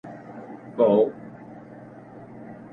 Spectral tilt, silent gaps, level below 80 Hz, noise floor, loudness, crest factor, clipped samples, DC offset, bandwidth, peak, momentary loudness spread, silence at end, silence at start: -9.5 dB/octave; none; -68 dBFS; -44 dBFS; -21 LUFS; 20 dB; under 0.1%; under 0.1%; 4.1 kHz; -8 dBFS; 24 LU; 0.2 s; 0.05 s